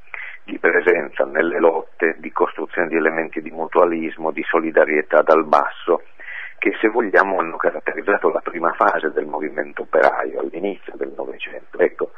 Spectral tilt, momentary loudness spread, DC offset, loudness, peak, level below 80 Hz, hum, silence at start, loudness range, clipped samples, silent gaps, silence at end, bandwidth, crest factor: -6.5 dB/octave; 13 LU; 1%; -19 LUFS; 0 dBFS; -62 dBFS; none; 0.15 s; 3 LU; under 0.1%; none; 0.1 s; 6.8 kHz; 20 dB